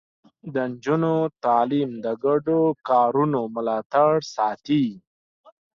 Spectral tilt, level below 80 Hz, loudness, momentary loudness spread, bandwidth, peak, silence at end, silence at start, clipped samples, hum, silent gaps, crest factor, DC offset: -7.5 dB/octave; -66 dBFS; -22 LUFS; 8 LU; 7.4 kHz; -6 dBFS; 0.75 s; 0.45 s; under 0.1%; none; 3.86-3.90 s; 16 dB; under 0.1%